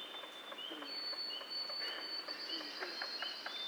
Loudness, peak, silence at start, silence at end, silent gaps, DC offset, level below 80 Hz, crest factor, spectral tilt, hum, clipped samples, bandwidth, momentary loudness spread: -41 LUFS; -26 dBFS; 0 s; 0 s; none; under 0.1%; under -90 dBFS; 18 dB; -0.5 dB/octave; none; under 0.1%; over 20 kHz; 6 LU